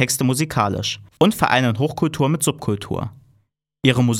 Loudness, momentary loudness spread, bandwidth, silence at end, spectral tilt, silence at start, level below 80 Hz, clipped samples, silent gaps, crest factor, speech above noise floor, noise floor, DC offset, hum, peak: -20 LUFS; 8 LU; 17 kHz; 0 s; -5 dB/octave; 0 s; -50 dBFS; under 0.1%; none; 18 dB; 45 dB; -64 dBFS; under 0.1%; none; -2 dBFS